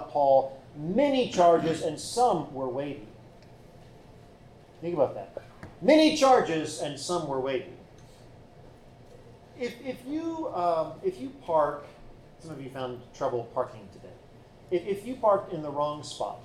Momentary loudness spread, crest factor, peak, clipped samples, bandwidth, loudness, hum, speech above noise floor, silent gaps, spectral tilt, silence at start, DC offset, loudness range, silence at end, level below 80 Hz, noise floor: 18 LU; 20 dB; -10 dBFS; under 0.1%; 14 kHz; -27 LUFS; none; 25 dB; none; -5 dB/octave; 0 s; under 0.1%; 10 LU; 0 s; -58 dBFS; -52 dBFS